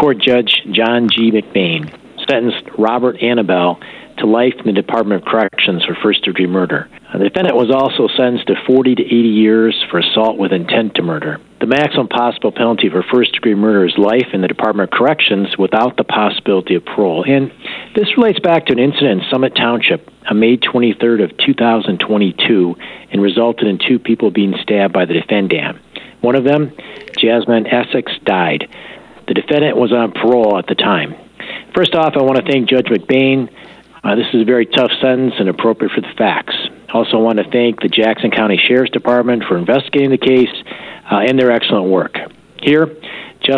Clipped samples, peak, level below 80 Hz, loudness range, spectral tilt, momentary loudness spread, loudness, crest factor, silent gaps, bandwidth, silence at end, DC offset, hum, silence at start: under 0.1%; -2 dBFS; -56 dBFS; 2 LU; -7.5 dB/octave; 8 LU; -13 LUFS; 12 dB; none; 6.4 kHz; 0 s; under 0.1%; none; 0 s